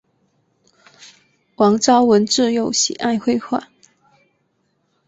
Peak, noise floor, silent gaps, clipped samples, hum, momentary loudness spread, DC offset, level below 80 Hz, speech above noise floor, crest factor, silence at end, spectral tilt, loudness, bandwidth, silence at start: -2 dBFS; -66 dBFS; none; under 0.1%; none; 8 LU; under 0.1%; -62 dBFS; 51 dB; 18 dB; 1.45 s; -3.5 dB/octave; -16 LUFS; 8 kHz; 1.6 s